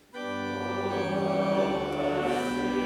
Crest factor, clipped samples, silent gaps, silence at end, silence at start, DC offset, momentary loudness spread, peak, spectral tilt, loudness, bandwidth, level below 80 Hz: 14 dB; under 0.1%; none; 0 s; 0.15 s; under 0.1%; 6 LU; -14 dBFS; -6 dB/octave; -29 LUFS; 16 kHz; -58 dBFS